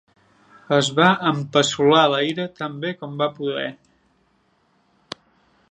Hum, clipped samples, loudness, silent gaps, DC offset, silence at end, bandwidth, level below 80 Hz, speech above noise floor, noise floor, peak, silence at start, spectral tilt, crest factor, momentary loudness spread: none; under 0.1%; -20 LUFS; none; under 0.1%; 1.95 s; 10 kHz; -66 dBFS; 44 dB; -63 dBFS; 0 dBFS; 0.7 s; -4.5 dB/octave; 22 dB; 18 LU